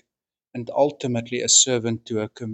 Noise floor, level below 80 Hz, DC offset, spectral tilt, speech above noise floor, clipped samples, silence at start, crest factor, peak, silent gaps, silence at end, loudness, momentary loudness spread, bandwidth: -86 dBFS; -66 dBFS; under 0.1%; -2.5 dB/octave; 64 dB; under 0.1%; 0.55 s; 20 dB; -4 dBFS; none; 0 s; -20 LUFS; 14 LU; 9.2 kHz